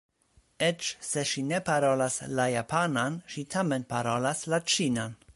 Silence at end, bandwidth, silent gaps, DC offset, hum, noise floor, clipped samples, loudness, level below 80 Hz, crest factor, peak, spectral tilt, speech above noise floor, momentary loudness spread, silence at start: 0.05 s; 11.5 kHz; none; under 0.1%; none; -66 dBFS; under 0.1%; -29 LUFS; -64 dBFS; 18 dB; -12 dBFS; -4 dB/octave; 37 dB; 6 LU; 0.6 s